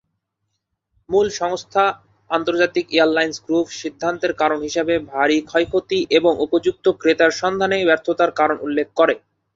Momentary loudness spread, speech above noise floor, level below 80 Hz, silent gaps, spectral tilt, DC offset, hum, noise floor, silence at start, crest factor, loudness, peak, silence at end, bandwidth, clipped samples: 6 LU; 57 dB; -56 dBFS; none; -4 dB/octave; under 0.1%; none; -76 dBFS; 1.1 s; 18 dB; -19 LUFS; -2 dBFS; 0.35 s; 7.8 kHz; under 0.1%